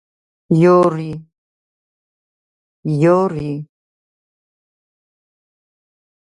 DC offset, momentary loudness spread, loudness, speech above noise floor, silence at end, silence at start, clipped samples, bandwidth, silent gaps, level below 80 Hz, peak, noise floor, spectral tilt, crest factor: under 0.1%; 17 LU; -15 LUFS; over 76 dB; 2.7 s; 0.5 s; under 0.1%; 10.5 kHz; 1.38-2.83 s; -58 dBFS; -2 dBFS; under -90 dBFS; -9 dB/octave; 18 dB